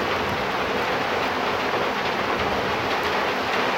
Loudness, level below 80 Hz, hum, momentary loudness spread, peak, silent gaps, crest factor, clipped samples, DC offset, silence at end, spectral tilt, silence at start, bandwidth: -23 LUFS; -48 dBFS; none; 1 LU; -10 dBFS; none; 14 dB; under 0.1%; under 0.1%; 0 s; -4 dB/octave; 0 s; 16.5 kHz